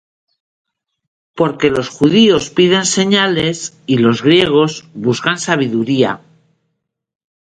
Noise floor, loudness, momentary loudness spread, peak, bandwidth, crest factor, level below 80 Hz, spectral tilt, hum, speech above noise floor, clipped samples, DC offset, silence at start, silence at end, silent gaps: -72 dBFS; -13 LUFS; 8 LU; 0 dBFS; 10.5 kHz; 14 dB; -50 dBFS; -4.5 dB/octave; none; 59 dB; under 0.1%; under 0.1%; 1.35 s; 1.25 s; none